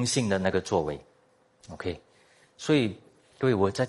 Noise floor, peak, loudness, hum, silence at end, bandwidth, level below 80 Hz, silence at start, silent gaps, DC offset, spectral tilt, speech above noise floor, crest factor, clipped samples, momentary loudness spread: -64 dBFS; -10 dBFS; -28 LUFS; none; 0 s; 11.5 kHz; -62 dBFS; 0 s; none; under 0.1%; -5 dB/octave; 37 dB; 18 dB; under 0.1%; 17 LU